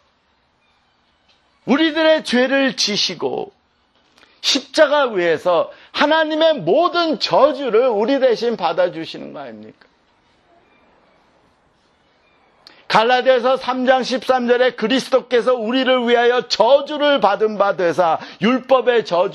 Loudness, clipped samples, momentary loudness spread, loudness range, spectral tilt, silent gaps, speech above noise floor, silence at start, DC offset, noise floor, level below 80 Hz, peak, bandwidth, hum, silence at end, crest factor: -16 LUFS; under 0.1%; 6 LU; 6 LU; -3.5 dB/octave; none; 45 dB; 1.65 s; under 0.1%; -61 dBFS; -66 dBFS; 0 dBFS; 12 kHz; none; 0 s; 18 dB